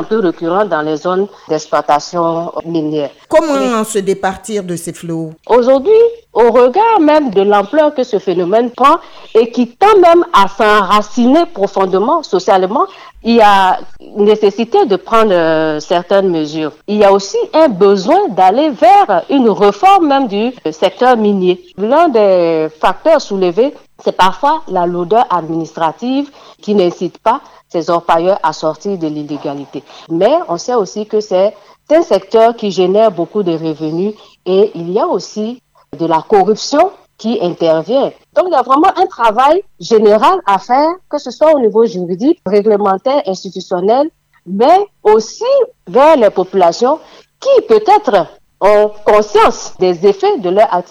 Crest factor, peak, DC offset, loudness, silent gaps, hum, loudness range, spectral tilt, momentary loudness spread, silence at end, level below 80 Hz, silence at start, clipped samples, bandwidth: 10 dB; 0 dBFS; under 0.1%; -12 LUFS; none; none; 5 LU; -5.5 dB/octave; 10 LU; 0.1 s; -48 dBFS; 0 s; under 0.1%; 14.5 kHz